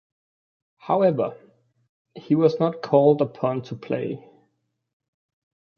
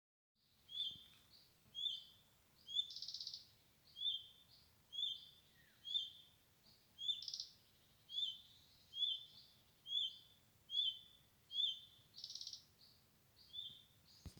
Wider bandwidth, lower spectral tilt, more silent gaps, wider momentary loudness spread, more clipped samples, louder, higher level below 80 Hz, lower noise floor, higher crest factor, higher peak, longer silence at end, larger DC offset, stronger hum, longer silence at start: second, 6.8 kHz vs over 20 kHz; first, -9 dB/octave vs 0 dB/octave; first, 1.89-2.05 s vs none; second, 12 LU vs 23 LU; neither; first, -22 LUFS vs -44 LUFS; first, -70 dBFS vs -82 dBFS; about the same, -73 dBFS vs -72 dBFS; about the same, 20 dB vs 20 dB; first, -4 dBFS vs -28 dBFS; first, 1.6 s vs 0 s; neither; neither; first, 0.85 s vs 0.7 s